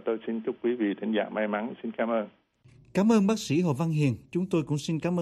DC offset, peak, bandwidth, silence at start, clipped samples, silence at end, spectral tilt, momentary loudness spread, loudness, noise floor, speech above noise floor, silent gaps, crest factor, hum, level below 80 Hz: under 0.1%; -12 dBFS; 13.5 kHz; 0.05 s; under 0.1%; 0 s; -6.5 dB/octave; 8 LU; -28 LUFS; -57 dBFS; 30 dB; none; 16 dB; none; -66 dBFS